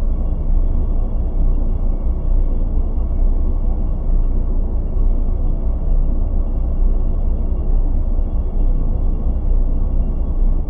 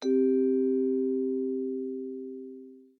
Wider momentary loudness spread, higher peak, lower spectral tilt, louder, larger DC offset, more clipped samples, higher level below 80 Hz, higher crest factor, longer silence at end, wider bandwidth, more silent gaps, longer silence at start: second, 2 LU vs 17 LU; first, -6 dBFS vs -16 dBFS; first, -12.5 dB/octave vs -6.5 dB/octave; first, -22 LUFS vs -28 LUFS; neither; neither; first, -14 dBFS vs under -90 dBFS; about the same, 10 dB vs 12 dB; second, 0 s vs 0.2 s; second, 1.4 kHz vs 6.4 kHz; neither; about the same, 0 s vs 0 s